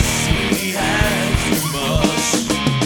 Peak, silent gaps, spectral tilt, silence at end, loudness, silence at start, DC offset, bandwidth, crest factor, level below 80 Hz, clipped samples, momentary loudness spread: 0 dBFS; none; -3.5 dB/octave; 0 s; -17 LUFS; 0 s; under 0.1%; 19.5 kHz; 16 dB; -28 dBFS; under 0.1%; 2 LU